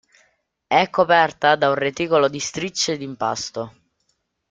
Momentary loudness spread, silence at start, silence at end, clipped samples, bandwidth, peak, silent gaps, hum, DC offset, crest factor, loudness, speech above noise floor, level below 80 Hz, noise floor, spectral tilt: 11 LU; 0.7 s; 0.8 s; under 0.1%; 9.4 kHz; -2 dBFS; none; none; under 0.1%; 20 dB; -20 LUFS; 51 dB; -62 dBFS; -70 dBFS; -3 dB/octave